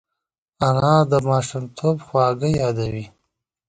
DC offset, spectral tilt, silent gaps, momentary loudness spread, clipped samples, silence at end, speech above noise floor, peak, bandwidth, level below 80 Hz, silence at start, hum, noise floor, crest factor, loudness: under 0.1%; -7 dB/octave; none; 12 LU; under 0.1%; 0.6 s; 64 dB; -2 dBFS; 9.4 kHz; -50 dBFS; 0.6 s; none; -83 dBFS; 18 dB; -20 LUFS